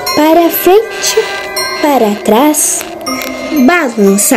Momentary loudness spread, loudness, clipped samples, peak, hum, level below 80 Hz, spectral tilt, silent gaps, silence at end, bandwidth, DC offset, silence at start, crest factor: 8 LU; -10 LUFS; 2%; 0 dBFS; none; -46 dBFS; -3 dB/octave; none; 0 s; over 20 kHz; under 0.1%; 0 s; 10 dB